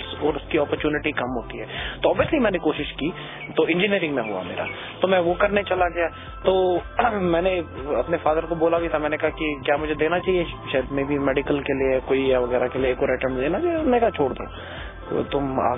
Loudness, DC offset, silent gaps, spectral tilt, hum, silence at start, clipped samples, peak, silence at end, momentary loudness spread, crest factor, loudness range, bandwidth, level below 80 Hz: -23 LUFS; under 0.1%; none; -10 dB/octave; none; 0 s; under 0.1%; -4 dBFS; 0 s; 8 LU; 18 dB; 1 LU; 3.9 kHz; -42 dBFS